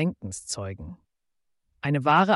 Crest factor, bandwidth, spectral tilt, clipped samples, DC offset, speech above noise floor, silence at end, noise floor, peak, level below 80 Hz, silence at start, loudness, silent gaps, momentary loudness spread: 18 dB; 11.5 kHz; -5 dB/octave; under 0.1%; under 0.1%; 50 dB; 0 s; -75 dBFS; -10 dBFS; -56 dBFS; 0 s; -27 LUFS; none; 19 LU